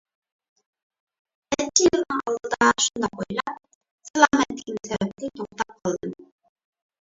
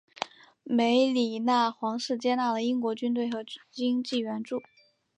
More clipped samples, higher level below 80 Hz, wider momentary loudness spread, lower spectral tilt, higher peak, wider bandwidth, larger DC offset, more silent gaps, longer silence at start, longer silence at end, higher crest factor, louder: neither; first, -58 dBFS vs -82 dBFS; about the same, 14 LU vs 13 LU; second, -2.5 dB/octave vs -4.5 dB/octave; first, -2 dBFS vs -12 dBFS; second, 7.8 kHz vs 9.6 kHz; neither; first, 3.75-3.81 s, 3.91-3.98 s, 4.10-4.14 s vs none; first, 1.5 s vs 0.2 s; first, 0.75 s vs 0.55 s; first, 24 dB vs 18 dB; first, -23 LUFS vs -28 LUFS